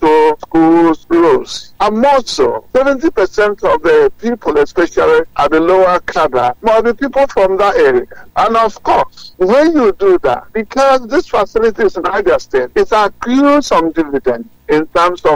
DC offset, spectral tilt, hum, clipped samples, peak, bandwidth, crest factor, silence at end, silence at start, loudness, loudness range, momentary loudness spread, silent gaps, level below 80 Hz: under 0.1%; -5 dB/octave; none; under 0.1%; -2 dBFS; 16.5 kHz; 8 dB; 0 s; 0 s; -12 LUFS; 1 LU; 6 LU; none; -38 dBFS